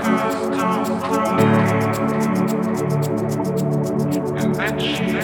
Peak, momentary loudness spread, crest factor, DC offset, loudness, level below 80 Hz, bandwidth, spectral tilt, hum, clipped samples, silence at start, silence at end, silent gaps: -4 dBFS; 5 LU; 16 dB; under 0.1%; -20 LUFS; -50 dBFS; 19.5 kHz; -6.5 dB/octave; none; under 0.1%; 0 s; 0 s; none